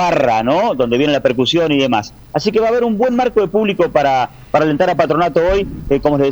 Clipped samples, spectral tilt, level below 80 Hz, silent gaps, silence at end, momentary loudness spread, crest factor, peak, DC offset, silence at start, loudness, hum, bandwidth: under 0.1%; -6 dB/octave; -38 dBFS; none; 0 s; 4 LU; 14 dB; 0 dBFS; under 0.1%; 0 s; -15 LUFS; none; over 20 kHz